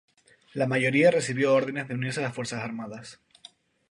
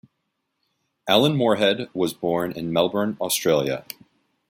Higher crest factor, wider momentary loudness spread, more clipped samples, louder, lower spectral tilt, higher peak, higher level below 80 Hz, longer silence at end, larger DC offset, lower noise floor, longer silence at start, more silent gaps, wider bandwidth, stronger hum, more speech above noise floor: about the same, 20 dB vs 22 dB; first, 19 LU vs 12 LU; neither; second, -26 LUFS vs -22 LUFS; about the same, -5.5 dB/octave vs -4.5 dB/octave; second, -8 dBFS vs -2 dBFS; second, -70 dBFS vs -62 dBFS; about the same, 0.75 s vs 0.7 s; neither; second, -54 dBFS vs -76 dBFS; second, 0.55 s vs 1.05 s; neither; second, 11.5 kHz vs 16.5 kHz; neither; second, 28 dB vs 55 dB